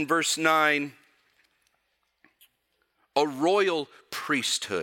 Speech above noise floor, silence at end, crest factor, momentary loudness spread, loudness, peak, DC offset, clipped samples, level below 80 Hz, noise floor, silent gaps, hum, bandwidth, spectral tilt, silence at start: 49 dB; 0 s; 22 dB; 13 LU; -25 LUFS; -6 dBFS; under 0.1%; under 0.1%; -82 dBFS; -74 dBFS; none; none; 17 kHz; -2.5 dB/octave; 0 s